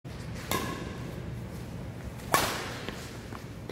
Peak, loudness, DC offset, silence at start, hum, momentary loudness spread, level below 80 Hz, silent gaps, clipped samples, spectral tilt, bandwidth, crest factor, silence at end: -4 dBFS; -34 LUFS; under 0.1%; 0.05 s; none; 13 LU; -48 dBFS; none; under 0.1%; -4 dB/octave; 16 kHz; 32 dB; 0 s